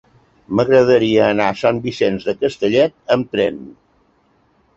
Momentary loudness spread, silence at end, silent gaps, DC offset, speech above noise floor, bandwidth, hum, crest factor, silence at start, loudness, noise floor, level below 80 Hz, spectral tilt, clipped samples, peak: 8 LU; 1.05 s; none; under 0.1%; 42 dB; 7.8 kHz; none; 16 dB; 0.5 s; -16 LUFS; -58 dBFS; -52 dBFS; -6.5 dB/octave; under 0.1%; -2 dBFS